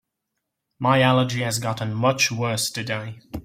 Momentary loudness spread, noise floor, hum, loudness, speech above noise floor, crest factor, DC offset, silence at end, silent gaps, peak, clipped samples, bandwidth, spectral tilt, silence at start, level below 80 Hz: 11 LU; -80 dBFS; none; -22 LUFS; 58 dB; 20 dB; under 0.1%; 0.05 s; none; -4 dBFS; under 0.1%; 16.5 kHz; -4.5 dB/octave; 0.8 s; -54 dBFS